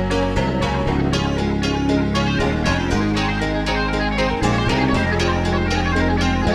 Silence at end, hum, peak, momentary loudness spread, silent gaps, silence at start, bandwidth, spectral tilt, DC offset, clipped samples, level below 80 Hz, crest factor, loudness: 0 s; none; -4 dBFS; 2 LU; none; 0 s; 13 kHz; -6 dB/octave; under 0.1%; under 0.1%; -28 dBFS; 14 dB; -19 LUFS